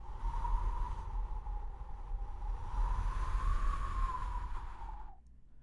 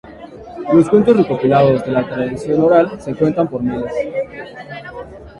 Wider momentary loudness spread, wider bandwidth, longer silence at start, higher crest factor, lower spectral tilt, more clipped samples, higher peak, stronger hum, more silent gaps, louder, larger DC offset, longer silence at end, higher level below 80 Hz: second, 10 LU vs 20 LU; second, 7.4 kHz vs 11.5 kHz; about the same, 0 s vs 0.05 s; about the same, 14 dB vs 16 dB; second, -6 dB/octave vs -8 dB/octave; neither; second, -22 dBFS vs 0 dBFS; neither; neither; second, -41 LUFS vs -15 LUFS; neither; about the same, 0 s vs 0 s; first, -36 dBFS vs -46 dBFS